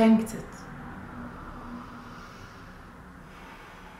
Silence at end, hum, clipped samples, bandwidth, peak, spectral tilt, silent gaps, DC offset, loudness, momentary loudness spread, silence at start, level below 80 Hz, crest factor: 0 s; none; under 0.1%; 15 kHz; -10 dBFS; -6.5 dB/octave; none; under 0.1%; -33 LUFS; 14 LU; 0 s; -52 dBFS; 22 dB